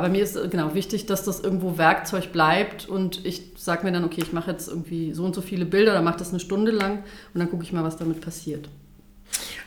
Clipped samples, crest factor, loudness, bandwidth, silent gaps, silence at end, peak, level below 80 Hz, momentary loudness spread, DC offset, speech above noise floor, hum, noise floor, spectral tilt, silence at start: under 0.1%; 22 dB; -25 LUFS; over 20 kHz; none; 0 s; -4 dBFS; -50 dBFS; 12 LU; under 0.1%; 25 dB; none; -50 dBFS; -5 dB/octave; 0 s